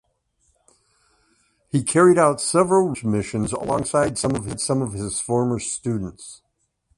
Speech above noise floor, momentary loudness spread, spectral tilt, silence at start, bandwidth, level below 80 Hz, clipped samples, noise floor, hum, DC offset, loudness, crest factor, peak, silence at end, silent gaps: 47 dB; 11 LU; -5 dB/octave; 1.75 s; 11.5 kHz; -50 dBFS; under 0.1%; -67 dBFS; none; under 0.1%; -21 LUFS; 18 dB; -4 dBFS; 0.65 s; none